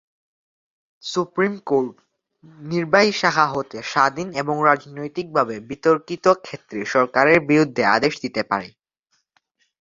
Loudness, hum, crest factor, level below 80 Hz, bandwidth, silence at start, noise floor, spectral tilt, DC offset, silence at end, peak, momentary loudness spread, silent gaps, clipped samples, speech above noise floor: -20 LUFS; none; 20 dB; -62 dBFS; 7.8 kHz; 1.05 s; -71 dBFS; -5 dB/octave; under 0.1%; 1.1 s; -2 dBFS; 13 LU; none; under 0.1%; 51 dB